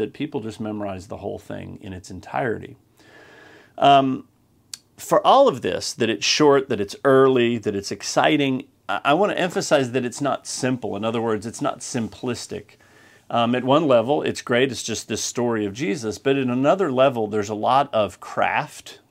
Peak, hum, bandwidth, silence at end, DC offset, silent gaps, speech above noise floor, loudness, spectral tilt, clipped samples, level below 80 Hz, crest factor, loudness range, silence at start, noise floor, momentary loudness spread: -2 dBFS; none; 16 kHz; 0.15 s; under 0.1%; none; 31 dB; -21 LUFS; -4.5 dB/octave; under 0.1%; -62 dBFS; 20 dB; 7 LU; 0 s; -52 dBFS; 16 LU